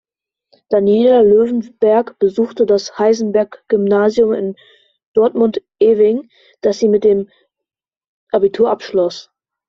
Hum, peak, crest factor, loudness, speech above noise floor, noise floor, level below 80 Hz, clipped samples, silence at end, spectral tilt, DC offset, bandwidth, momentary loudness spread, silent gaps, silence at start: none; -2 dBFS; 12 dB; -15 LUFS; 70 dB; -83 dBFS; -56 dBFS; under 0.1%; 0.45 s; -6.5 dB/octave; under 0.1%; 7.2 kHz; 9 LU; 5.06-5.14 s, 7.97-8.01 s, 8.07-8.27 s; 0.7 s